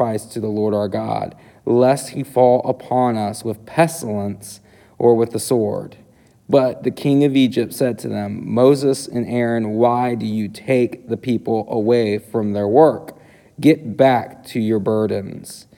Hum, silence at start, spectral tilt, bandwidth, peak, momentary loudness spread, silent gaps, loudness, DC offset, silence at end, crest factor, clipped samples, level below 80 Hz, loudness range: none; 0 s; -6.5 dB/octave; 18.5 kHz; 0 dBFS; 11 LU; none; -18 LUFS; under 0.1%; 0.15 s; 18 dB; under 0.1%; -60 dBFS; 2 LU